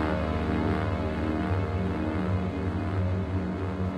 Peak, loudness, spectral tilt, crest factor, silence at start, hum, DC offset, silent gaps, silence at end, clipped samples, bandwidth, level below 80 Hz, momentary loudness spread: -14 dBFS; -29 LUFS; -8.5 dB/octave; 14 dB; 0 s; none; under 0.1%; none; 0 s; under 0.1%; 8.6 kHz; -38 dBFS; 3 LU